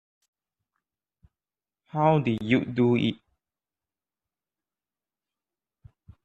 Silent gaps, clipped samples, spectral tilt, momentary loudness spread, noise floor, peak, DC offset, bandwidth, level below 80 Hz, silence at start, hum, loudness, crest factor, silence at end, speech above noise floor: none; under 0.1%; -8.5 dB/octave; 10 LU; under -90 dBFS; -8 dBFS; under 0.1%; 7.8 kHz; -64 dBFS; 1.95 s; none; -25 LUFS; 22 dB; 3.1 s; over 67 dB